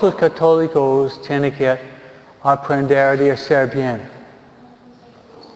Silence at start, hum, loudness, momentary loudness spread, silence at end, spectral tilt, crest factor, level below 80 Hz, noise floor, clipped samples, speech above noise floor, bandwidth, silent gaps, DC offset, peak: 0 s; none; -17 LUFS; 10 LU; 0.15 s; -7.5 dB/octave; 16 dB; -56 dBFS; -45 dBFS; under 0.1%; 29 dB; 8 kHz; none; under 0.1%; -2 dBFS